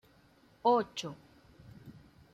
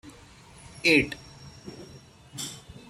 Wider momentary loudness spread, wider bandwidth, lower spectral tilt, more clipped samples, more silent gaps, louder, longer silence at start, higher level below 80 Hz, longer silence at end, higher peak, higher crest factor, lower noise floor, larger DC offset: about the same, 25 LU vs 26 LU; second, 14 kHz vs 16 kHz; first, -5 dB/octave vs -3.5 dB/octave; neither; neither; second, -32 LUFS vs -25 LUFS; first, 0.65 s vs 0.05 s; second, -70 dBFS vs -56 dBFS; first, 0.45 s vs 0.3 s; second, -16 dBFS vs -8 dBFS; about the same, 20 dB vs 24 dB; first, -64 dBFS vs -51 dBFS; neither